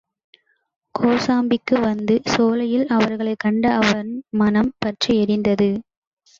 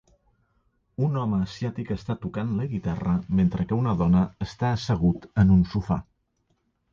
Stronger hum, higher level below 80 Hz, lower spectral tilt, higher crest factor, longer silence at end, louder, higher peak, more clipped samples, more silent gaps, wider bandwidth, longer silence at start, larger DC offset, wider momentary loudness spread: neither; second, -52 dBFS vs -42 dBFS; second, -5.5 dB/octave vs -8.5 dB/octave; about the same, 16 dB vs 18 dB; second, 0.6 s vs 0.9 s; first, -19 LUFS vs -25 LUFS; first, -4 dBFS vs -8 dBFS; neither; neither; about the same, 7.6 kHz vs 7.2 kHz; about the same, 0.95 s vs 1 s; neither; second, 5 LU vs 9 LU